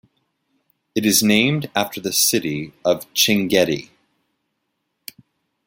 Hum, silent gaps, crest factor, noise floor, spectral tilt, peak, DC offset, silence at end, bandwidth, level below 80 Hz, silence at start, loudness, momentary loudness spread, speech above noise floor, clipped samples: none; none; 20 dB; -74 dBFS; -3 dB/octave; -2 dBFS; under 0.1%; 1.8 s; 17 kHz; -58 dBFS; 0.95 s; -18 LUFS; 18 LU; 56 dB; under 0.1%